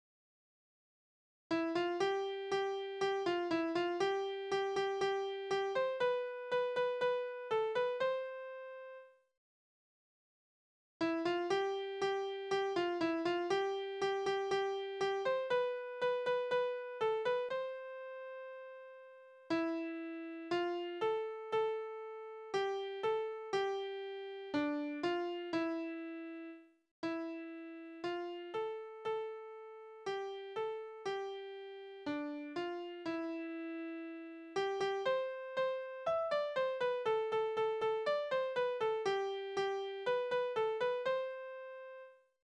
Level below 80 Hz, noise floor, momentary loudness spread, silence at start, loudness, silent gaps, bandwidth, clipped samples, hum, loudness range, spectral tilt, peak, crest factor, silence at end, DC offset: -82 dBFS; under -90 dBFS; 12 LU; 1.5 s; -38 LUFS; 9.37-11.00 s, 26.91-27.03 s; 9.8 kHz; under 0.1%; none; 7 LU; -4.5 dB/octave; -24 dBFS; 16 dB; 0.35 s; under 0.1%